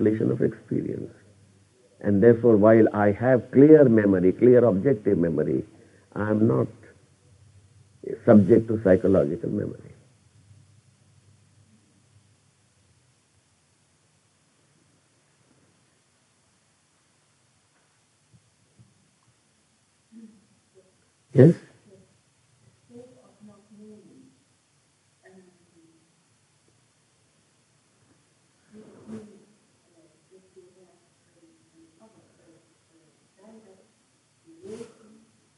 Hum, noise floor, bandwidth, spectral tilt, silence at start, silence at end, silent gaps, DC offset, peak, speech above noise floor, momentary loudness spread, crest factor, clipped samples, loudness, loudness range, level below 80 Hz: none; -66 dBFS; 11 kHz; -10 dB/octave; 0 s; 0.75 s; none; under 0.1%; -2 dBFS; 47 dB; 26 LU; 24 dB; under 0.1%; -20 LUFS; 9 LU; -58 dBFS